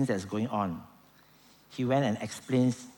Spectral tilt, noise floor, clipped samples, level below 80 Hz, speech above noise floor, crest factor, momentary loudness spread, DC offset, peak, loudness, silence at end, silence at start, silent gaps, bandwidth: -6.5 dB/octave; -60 dBFS; under 0.1%; -68 dBFS; 30 dB; 16 dB; 9 LU; under 0.1%; -14 dBFS; -30 LUFS; 0.05 s; 0 s; none; 19 kHz